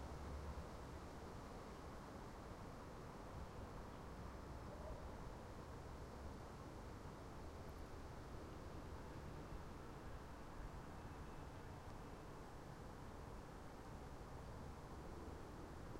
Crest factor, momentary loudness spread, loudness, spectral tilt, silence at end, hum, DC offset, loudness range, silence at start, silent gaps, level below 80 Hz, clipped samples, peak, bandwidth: 14 dB; 2 LU; -55 LUFS; -6 dB/octave; 0 s; none; under 0.1%; 1 LU; 0 s; none; -58 dBFS; under 0.1%; -40 dBFS; 16 kHz